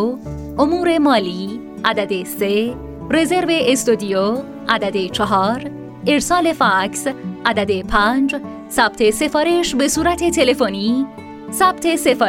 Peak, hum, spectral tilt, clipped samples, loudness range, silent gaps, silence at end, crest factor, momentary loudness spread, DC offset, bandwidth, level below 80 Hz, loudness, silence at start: 0 dBFS; none; -4 dB/octave; under 0.1%; 2 LU; none; 0 s; 16 dB; 9 LU; under 0.1%; 16.5 kHz; -40 dBFS; -17 LUFS; 0 s